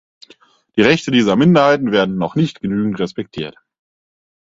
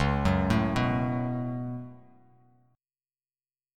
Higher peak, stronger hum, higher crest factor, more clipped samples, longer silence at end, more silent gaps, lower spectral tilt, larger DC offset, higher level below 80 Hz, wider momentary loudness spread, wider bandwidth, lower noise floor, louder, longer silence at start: first, 0 dBFS vs -12 dBFS; neither; about the same, 16 dB vs 18 dB; neither; second, 1 s vs 1.8 s; neither; about the same, -6.5 dB/octave vs -7.5 dB/octave; neither; second, -52 dBFS vs -42 dBFS; about the same, 14 LU vs 13 LU; second, 7.8 kHz vs 13 kHz; second, -50 dBFS vs under -90 dBFS; first, -15 LUFS vs -28 LUFS; first, 0.75 s vs 0 s